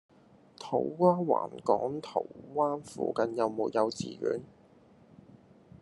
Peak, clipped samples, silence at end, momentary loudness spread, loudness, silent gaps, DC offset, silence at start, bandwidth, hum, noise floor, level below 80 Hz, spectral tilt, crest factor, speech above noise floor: -10 dBFS; under 0.1%; 1.35 s; 9 LU; -31 LUFS; none; under 0.1%; 0.6 s; 11.5 kHz; none; -59 dBFS; -74 dBFS; -6.5 dB/octave; 22 dB; 29 dB